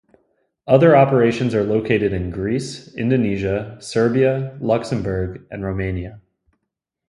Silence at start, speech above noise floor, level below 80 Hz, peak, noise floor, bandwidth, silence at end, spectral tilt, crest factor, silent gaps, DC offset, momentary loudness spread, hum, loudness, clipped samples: 0.65 s; 61 dB; -42 dBFS; 0 dBFS; -79 dBFS; 11.5 kHz; 0.9 s; -7.5 dB/octave; 18 dB; none; under 0.1%; 14 LU; none; -19 LUFS; under 0.1%